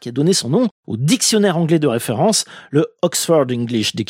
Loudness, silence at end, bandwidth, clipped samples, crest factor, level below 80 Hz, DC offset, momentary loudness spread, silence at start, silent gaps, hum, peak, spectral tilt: -16 LUFS; 0.05 s; 16.5 kHz; under 0.1%; 14 dB; -62 dBFS; under 0.1%; 5 LU; 0 s; 0.71-0.83 s; none; -2 dBFS; -4.5 dB/octave